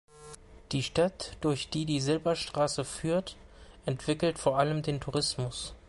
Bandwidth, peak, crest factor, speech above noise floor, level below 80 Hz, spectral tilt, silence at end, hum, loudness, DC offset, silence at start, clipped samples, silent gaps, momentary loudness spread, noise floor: 11.5 kHz; -14 dBFS; 18 dB; 20 dB; -54 dBFS; -5 dB/octave; 0.1 s; none; -31 LUFS; under 0.1%; 0.15 s; under 0.1%; none; 11 LU; -50 dBFS